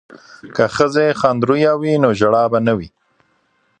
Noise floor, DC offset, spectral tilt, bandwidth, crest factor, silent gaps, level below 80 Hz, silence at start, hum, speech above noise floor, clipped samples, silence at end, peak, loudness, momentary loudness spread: -62 dBFS; under 0.1%; -6.5 dB/octave; 9.6 kHz; 16 dB; none; -50 dBFS; 0.15 s; none; 46 dB; under 0.1%; 0.95 s; 0 dBFS; -15 LUFS; 7 LU